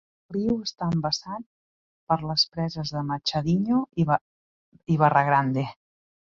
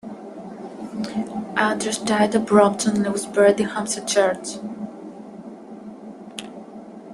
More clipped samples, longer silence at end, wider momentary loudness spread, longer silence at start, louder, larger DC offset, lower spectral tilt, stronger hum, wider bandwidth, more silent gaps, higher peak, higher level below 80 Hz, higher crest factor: neither; first, 0.6 s vs 0 s; second, 10 LU vs 22 LU; first, 0.3 s vs 0.05 s; second, -25 LUFS vs -21 LUFS; neither; first, -6 dB/octave vs -4 dB/octave; neither; second, 7.4 kHz vs 12.5 kHz; first, 1.46-2.07 s, 4.21-4.72 s vs none; about the same, -6 dBFS vs -4 dBFS; first, -56 dBFS vs -62 dBFS; about the same, 20 dB vs 20 dB